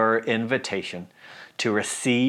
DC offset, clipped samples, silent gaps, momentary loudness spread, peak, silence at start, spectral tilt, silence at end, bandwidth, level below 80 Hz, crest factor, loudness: under 0.1%; under 0.1%; none; 16 LU; -8 dBFS; 0 s; -4 dB/octave; 0 s; 14.5 kHz; -74 dBFS; 16 dB; -25 LUFS